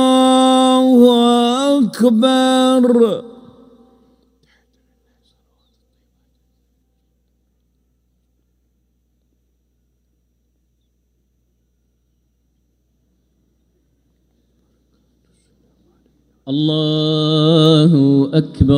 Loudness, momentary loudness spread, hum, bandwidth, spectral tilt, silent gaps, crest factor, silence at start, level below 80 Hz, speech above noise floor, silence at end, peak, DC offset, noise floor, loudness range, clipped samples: -13 LUFS; 7 LU; 60 Hz at -65 dBFS; 15.5 kHz; -6.5 dB/octave; none; 18 dB; 0 s; -46 dBFS; 51 dB; 0 s; 0 dBFS; under 0.1%; -64 dBFS; 12 LU; under 0.1%